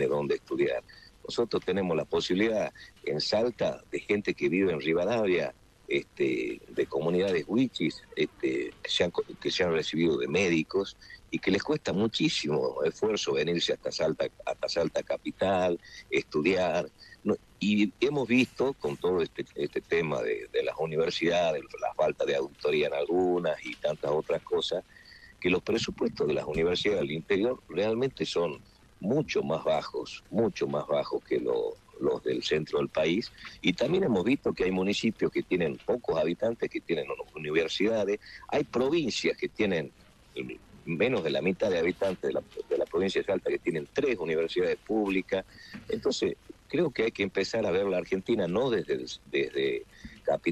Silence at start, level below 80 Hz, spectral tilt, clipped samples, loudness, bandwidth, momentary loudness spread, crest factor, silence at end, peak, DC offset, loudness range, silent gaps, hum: 0 s; -60 dBFS; -5 dB/octave; under 0.1%; -29 LUFS; 12.5 kHz; 7 LU; 20 dB; 0 s; -10 dBFS; under 0.1%; 2 LU; none; none